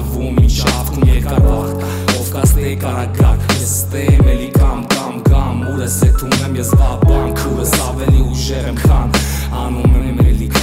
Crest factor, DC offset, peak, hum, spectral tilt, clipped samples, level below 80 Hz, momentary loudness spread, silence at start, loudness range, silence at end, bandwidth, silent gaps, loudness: 10 dB; under 0.1%; -2 dBFS; none; -5.5 dB/octave; under 0.1%; -16 dBFS; 6 LU; 0 s; 1 LU; 0 s; 16.5 kHz; none; -14 LUFS